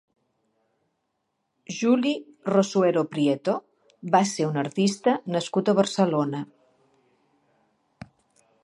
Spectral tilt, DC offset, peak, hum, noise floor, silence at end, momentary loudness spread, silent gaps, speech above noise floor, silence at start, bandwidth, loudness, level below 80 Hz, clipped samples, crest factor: -5.5 dB/octave; under 0.1%; -6 dBFS; none; -77 dBFS; 2.2 s; 9 LU; none; 54 dB; 1.7 s; 11.5 kHz; -24 LUFS; -74 dBFS; under 0.1%; 20 dB